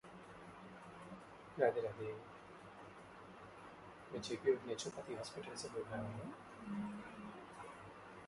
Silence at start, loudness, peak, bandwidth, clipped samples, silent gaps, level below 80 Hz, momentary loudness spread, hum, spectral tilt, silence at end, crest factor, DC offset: 0.05 s; -45 LUFS; -22 dBFS; 11.5 kHz; under 0.1%; none; -74 dBFS; 18 LU; none; -5 dB/octave; 0 s; 24 dB; under 0.1%